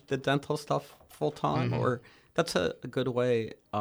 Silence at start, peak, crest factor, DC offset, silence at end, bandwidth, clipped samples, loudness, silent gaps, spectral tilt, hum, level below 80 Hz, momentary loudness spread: 0.1 s; -14 dBFS; 18 dB; under 0.1%; 0 s; over 20 kHz; under 0.1%; -31 LUFS; none; -6 dB/octave; none; -62 dBFS; 6 LU